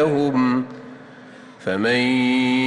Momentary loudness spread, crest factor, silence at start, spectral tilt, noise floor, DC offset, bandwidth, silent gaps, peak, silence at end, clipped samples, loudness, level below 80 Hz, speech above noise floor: 21 LU; 12 dB; 0 s; -6 dB/octave; -42 dBFS; under 0.1%; 10.5 kHz; none; -8 dBFS; 0 s; under 0.1%; -20 LUFS; -60 dBFS; 24 dB